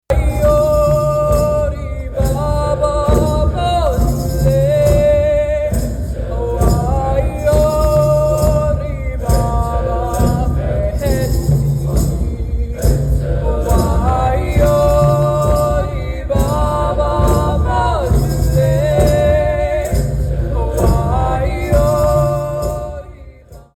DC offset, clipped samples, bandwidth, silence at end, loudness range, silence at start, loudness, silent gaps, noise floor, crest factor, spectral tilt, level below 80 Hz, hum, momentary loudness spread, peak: under 0.1%; under 0.1%; 16.5 kHz; 0.15 s; 2 LU; 0.1 s; -15 LUFS; none; -38 dBFS; 10 dB; -7 dB/octave; -18 dBFS; none; 7 LU; -4 dBFS